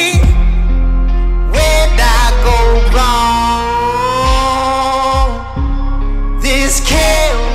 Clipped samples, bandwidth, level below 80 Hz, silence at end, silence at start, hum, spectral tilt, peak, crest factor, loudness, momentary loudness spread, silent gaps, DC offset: under 0.1%; 15 kHz; -12 dBFS; 0 s; 0 s; none; -4 dB/octave; 0 dBFS; 10 dB; -13 LUFS; 7 LU; none; under 0.1%